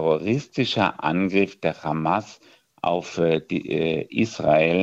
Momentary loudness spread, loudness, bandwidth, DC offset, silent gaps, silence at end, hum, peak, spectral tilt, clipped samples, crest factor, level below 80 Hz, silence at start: 6 LU; -23 LUFS; 8 kHz; under 0.1%; none; 0 s; none; -4 dBFS; -6 dB/octave; under 0.1%; 20 dB; -58 dBFS; 0 s